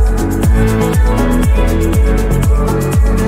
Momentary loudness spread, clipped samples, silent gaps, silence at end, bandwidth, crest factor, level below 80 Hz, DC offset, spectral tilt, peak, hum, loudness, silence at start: 1 LU; under 0.1%; none; 0 s; 16 kHz; 10 dB; -12 dBFS; under 0.1%; -7 dB/octave; -2 dBFS; none; -13 LUFS; 0 s